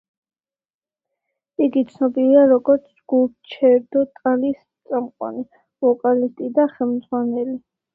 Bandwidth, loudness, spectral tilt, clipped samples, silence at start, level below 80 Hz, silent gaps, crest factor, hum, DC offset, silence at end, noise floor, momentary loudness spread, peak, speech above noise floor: 4.2 kHz; -19 LUFS; -8.5 dB/octave; under 0.1%; 1.6 s; -68 dBFS; none; 16 dB; none; under 0.1%; 0.35 s; under -90 dBFS; 14 LU; -2 dBFS; over 72 dB